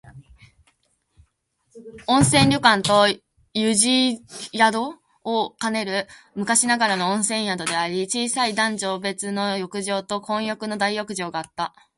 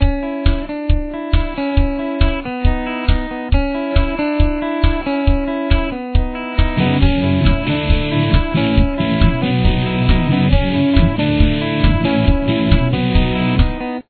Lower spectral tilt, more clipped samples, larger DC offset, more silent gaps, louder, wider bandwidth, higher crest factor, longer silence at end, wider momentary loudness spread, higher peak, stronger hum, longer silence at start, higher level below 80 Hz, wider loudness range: second, -3 dB/octave vs -10.5 dB/octave; neither; neither; neither; second, -21 LUFS vs -17 LUFS; first, 11.5 kHz vs 4.6 kHz; first, 22 dB vs 14 dB; first, 0.3 s vs 0.1 s; first, 13 LU vs 5 LU; about the same, 0 dBFS vs 0 dBFS; neither; about the same, 0.05 s vs 0 s; second, -56 dBFS vs -18 dBFS; about the same, 5 LU vs 4 LU